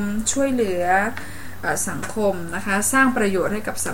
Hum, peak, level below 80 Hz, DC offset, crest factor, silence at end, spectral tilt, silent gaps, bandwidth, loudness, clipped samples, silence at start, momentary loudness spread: none; -6 dBFS; -44 dBFS; 3%; 16 dB; 0 s; -3.5 dB/octave; none; 17 kHz; -21 LUFS; under 0.1%; 0 s; 10 LU